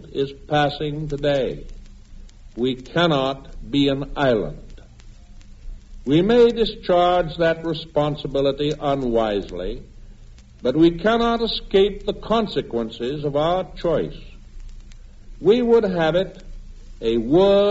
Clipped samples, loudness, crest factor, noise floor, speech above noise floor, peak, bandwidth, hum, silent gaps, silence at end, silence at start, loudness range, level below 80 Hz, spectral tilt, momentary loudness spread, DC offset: under 0.1%; -21 LUFS; 16 dB; -43 dBFS; 24 dB; -6 dBFS; 8 kHz; none; none; 0 s; 0 s; 4 LU; -38 dBFS; -4.5 dB/octave; 11 LU; under 0.1%